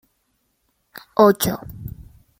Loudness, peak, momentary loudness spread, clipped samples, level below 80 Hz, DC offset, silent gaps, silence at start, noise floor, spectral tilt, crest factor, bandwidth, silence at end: -18 LUFS; -2 dBFS; 21 LU; under 0.1%; -48 dBFS; under 0.1%; none; 1.2 s; -69 dBFS; -5 dB/octave; 22 dB; 16.5 kHz; 0.4 s